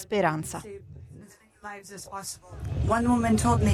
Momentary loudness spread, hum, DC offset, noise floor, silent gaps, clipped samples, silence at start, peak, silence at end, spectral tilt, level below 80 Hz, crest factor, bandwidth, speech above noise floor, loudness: 22 LU; none; under 0.1%; -51 dBFS; none; under 0.1%; 0 s; -10 dBFS; 0 s; -6 dB/octave; -40 dBFS; 16 dB; 15 kHz; 24 dB; -27 LUFS